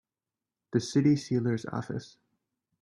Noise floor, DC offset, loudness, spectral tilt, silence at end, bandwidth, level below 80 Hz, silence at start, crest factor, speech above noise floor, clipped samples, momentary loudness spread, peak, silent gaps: under -90 dBFS; under 0.1%; -29 LUFS; -6.5 dB/octave; 0.75 s; 11.5 kHz; -66 dBFS; 0.75 s; 18 dB; over 62 dB; under 0.1%; 12 LU; -14 dBFS; none